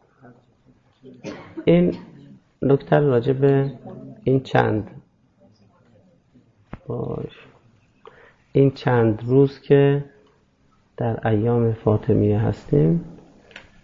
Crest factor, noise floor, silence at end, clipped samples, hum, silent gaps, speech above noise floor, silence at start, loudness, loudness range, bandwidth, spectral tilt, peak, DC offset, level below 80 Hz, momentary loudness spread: 18 dB; -60 dBFS; 0.25 s; under 0.1%; none; none; 41 dB; 1.05 s; -20 LUFS; 8 LU; 6.8 kHz; -9.5 dB/octave; -4 dBFS; under 0.1%; -48 dBFS; 19 LU